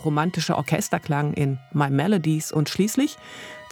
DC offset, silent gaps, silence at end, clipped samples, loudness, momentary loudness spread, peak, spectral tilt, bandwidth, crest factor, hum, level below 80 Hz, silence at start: under 0.1%; none; 0 s; under 0.1%; -23 LUFS; 5 LU; -6 dBFS; -5.5 dB/octave; 19.5 kHz; 18 dB; none; -62 dBFS; 0 s